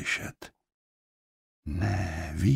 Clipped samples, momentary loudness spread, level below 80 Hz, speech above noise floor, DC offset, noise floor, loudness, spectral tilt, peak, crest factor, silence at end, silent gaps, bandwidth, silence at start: under 0.1%; 19 LU; -44 dBFS; over 62 dB; under 0.1%; under -90 dBFS; -32 LUFS; -6 dB/octave; -12 dBFS; 18 dB; 0 s; 0.74-1.63 s; 15.5 kHz; 0 s